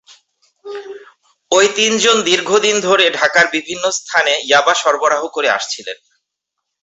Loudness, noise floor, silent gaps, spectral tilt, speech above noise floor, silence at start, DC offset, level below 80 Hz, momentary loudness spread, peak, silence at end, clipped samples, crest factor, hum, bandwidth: -13 LUFS; -77 dBFS; none; -1 dB/octave; 63 dB; 0.65 s; under 0.1%; -62 dBFS; 18 LU; 0 dBFS; 0.9 s; under 0.1%; 16 dB; none; 8.2 kHz